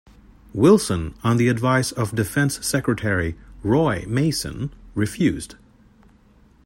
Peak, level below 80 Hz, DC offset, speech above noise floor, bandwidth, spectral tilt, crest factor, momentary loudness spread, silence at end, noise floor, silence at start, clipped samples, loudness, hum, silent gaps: -4 dBFS; -44 dBFS; under 0.1%; 33 dB; 16.5 kHz; -5.5 dB/octave; 18 dB; 12 LU; 1.1 s; -54 dBFS; 0.55 s; under 0.1%; -21 LUFS; none; none